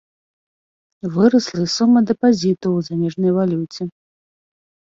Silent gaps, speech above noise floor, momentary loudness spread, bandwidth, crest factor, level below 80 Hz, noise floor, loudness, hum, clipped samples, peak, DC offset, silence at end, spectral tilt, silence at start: none; over 73 dB; 13 LU; 7.6 kHz; 16 dB; -60 dBFS; under -90 dBFS; -17 LUFS; none; under 0.1%; -2 dBFS; under 0.1%; 0.95 s; -6.5 dB/octave; 1.05 s